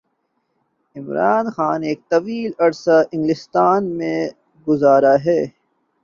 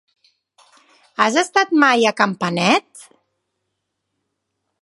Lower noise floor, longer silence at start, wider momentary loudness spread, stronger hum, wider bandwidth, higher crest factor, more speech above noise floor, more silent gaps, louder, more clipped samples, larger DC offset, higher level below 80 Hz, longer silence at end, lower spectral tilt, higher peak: second, -69 dBFS vs -76 dBFS; second, 0.95 s vs 1.2 s; first, 12 LU vs 5 LU; neither; second, 7.4 kHz vs 11.5 kHz; about the same, 16 dB vs 20 dB; second, 53 dB vs 59 dB; neither; about the same, -18 LUFS vs -16 LUFS; neither; neither; first, -62 dBFS vs -70 dBFS; second, 0.55 s vs 1.8 s; first, -7 dB/octave vs -4 dB/octave; about the same, -2 dBFS vs 0 dBFS